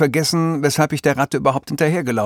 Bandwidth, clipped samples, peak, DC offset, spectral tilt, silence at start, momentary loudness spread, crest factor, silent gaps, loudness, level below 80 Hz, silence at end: 18 kHz; under 0.1%; -2 dBFS; under 0.1%; -5 dB/octave; 0 s; 2 LU; 16 dB; none; -18 LUFS; -54 dBFS; 0 s